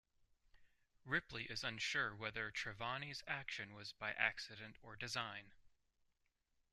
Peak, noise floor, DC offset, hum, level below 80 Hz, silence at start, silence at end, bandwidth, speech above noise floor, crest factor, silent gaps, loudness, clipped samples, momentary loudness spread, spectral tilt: -20 dBFS; -83 dBFS; under 0.1%; none; -72 dBFS; 0.6 s; 1.05 s; 13.5 kHz; 38 dB; 26 dB; none; -44 LUFS; under 0.1%; 11 LU; -3 dB/octave